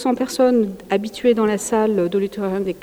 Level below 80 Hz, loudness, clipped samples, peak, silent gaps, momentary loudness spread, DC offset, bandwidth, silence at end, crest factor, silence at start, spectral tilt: -54 dBFS; -19 LUFS; under 0.1%; -4 dBFS; none; 6 LU; under 0.1%; 17 kHz; 0.05 s; 14 dB; 0 s; -5.5 dB/octave